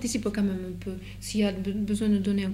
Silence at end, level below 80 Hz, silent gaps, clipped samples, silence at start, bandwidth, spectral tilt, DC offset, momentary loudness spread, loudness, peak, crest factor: 0 s; -46 dBFS; none; under 0.1%; 0 s; 14.5 kHz; -5.5 dB/octave; under 0.1%; 11 LU; -28 LUFS; -14 dBFS; 14 dB